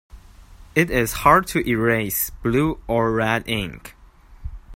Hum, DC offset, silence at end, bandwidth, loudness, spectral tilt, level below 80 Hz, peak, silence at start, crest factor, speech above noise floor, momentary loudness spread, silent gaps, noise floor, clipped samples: none; under 0.1%; 0 s; 16.5 kHz; -20 LUFS; -5 dB/octave; -38 dBFS; 0 dBFS; 0.15 s; 22 dB; 25 dB; 19 LU; none; -45 dBFS; under 0.1%